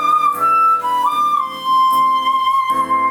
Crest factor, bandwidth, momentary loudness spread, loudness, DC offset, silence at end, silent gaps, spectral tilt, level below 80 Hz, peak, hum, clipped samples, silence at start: 8 dB; 19.5 kHz; 4 LU; -15 LUFS; under 0.1%; 0 s; none; -2.5 dB/octave; -60 dBFS; -6 dBFS; none; under 0.1%; 0 s